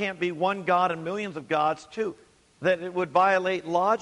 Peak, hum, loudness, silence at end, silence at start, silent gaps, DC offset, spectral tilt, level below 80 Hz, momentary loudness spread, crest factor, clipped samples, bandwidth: -8 dBFS; none; -26 LUFS; 0 s; 0 s; none; under 0.1%; -5.5 dB/octave; -68 dBFS; 10 LU; 18 dB; under 0.1%; 11 kHz